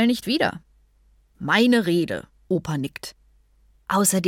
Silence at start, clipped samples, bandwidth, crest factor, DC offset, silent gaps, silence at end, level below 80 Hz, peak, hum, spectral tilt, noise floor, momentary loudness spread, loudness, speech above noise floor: 0 s; under 0.1%; 17 kHz; 18 dB; under 0.1%; none; 0 s; -56 dBFS; -6 dBFS; none; -4 dB/octave; -59 dBFS; 19 LU; -22 LUFS; 37 dB